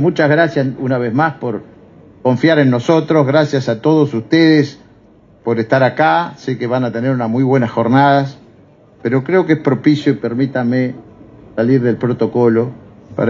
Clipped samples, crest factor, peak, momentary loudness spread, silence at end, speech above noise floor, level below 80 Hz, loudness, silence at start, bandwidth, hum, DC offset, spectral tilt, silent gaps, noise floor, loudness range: under 0.1%; 14 dB; 0 dBFS; 11 LU; 0 s; 33 dB; -56 dBFS; -14 LUFS; 0 s; 7.4 kHz; none; under 0.1%; -8 dB/octave; none; -46 dBFS; 3 LU